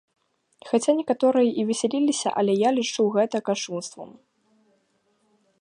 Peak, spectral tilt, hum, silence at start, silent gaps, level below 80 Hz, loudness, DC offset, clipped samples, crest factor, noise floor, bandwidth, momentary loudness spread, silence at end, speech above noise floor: -8 dBFS; -4.5 dB/octave; none; 0.65 s; none; -76 dBFS; -23 LUFS; under 0.1%; under 0.1%; 18 dB; -68 dBFS; 11.5 kHz; 11 LU; 1.5 s; 45 dB